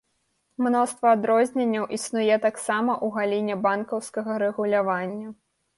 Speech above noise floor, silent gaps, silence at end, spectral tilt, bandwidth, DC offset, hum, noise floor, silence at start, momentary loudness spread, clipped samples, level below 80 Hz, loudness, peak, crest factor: 49 dB; none; 0.45 s; -5 dB/octave; 11.5 kHz; under 0.1%; none; -72 dBFS; 0.6 s; 8 LU; under 0.1%; -72 dBFS; -24 LUFS; -8 dBFS; 16 dB